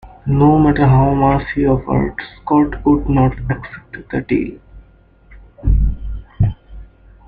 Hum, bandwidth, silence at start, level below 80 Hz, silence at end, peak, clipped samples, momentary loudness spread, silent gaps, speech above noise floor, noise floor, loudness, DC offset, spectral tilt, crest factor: none; 4.7 kHz; 0.05 s; -26 dBFS; 0.45 s; -2 dBFS; under 0.1%; 16 LU; none; 33 dB; -47 dBFS; -16 LUFS; under 0.1%; -11.5 dB/octave; 14 dB